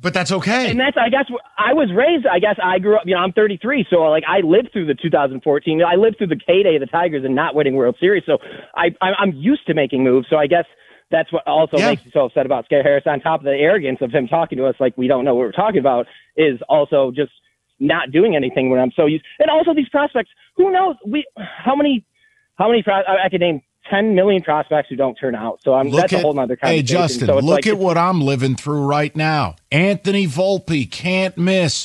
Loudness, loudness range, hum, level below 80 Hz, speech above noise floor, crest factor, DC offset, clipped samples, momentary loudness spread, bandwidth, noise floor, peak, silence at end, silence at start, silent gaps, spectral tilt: -17 LUFS; 2 LU; none; -56 dBFS; 43 dB; 14 dB; under 0.1%; under 0.1%; 5 LU; 11.5 kHz; -59 dBFS; -2 dBFS; 0 s; 0.05 s; none; -6 dB/octave